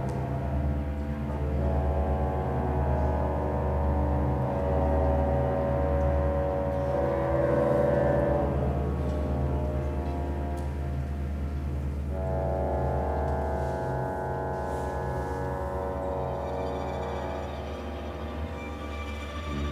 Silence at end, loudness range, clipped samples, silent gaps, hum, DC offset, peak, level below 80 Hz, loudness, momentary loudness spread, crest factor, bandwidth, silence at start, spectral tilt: 0 s; 6 LU; under 0.1%; none; none; under 0.1%; -14 dBFS; -32 dBFS; -29 LUFS; 9 LU; 14 dB; 8 kHz; 0 s; -8.5 dB/octave